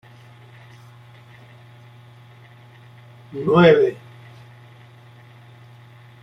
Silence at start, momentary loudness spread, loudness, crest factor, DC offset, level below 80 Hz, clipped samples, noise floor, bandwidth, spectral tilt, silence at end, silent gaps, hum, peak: 3.35 s; 31 LU; -16 LUFS; 22 dB; under 0.1%; -58 dBFS; under 0.1%; -46 dBFS; 6.2 kHz; -8 dB/octave; 2.3 s; none; none; -2 dBFS